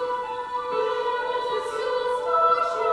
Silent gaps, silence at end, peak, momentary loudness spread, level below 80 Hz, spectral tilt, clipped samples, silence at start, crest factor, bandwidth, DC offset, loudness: none; 0 s; -10 dBFS; 8 LU; -62 dBFS; -2.5 dB/octave; under 0.1%; 0 s; 14 dB; 11 kHz; under 0.1%; -25 LUFS